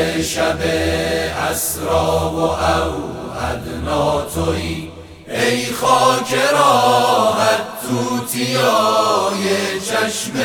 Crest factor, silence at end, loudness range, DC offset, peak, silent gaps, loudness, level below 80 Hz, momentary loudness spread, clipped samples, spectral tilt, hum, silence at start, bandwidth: 16 dB; 0 s; 5 LU; under 0.1%; 0 dBFS; none; -17 LUFS; -36 dBFS; 10 LU; under 0.1%; -3.5 dB/octave; none; 0 s; over 20 kHz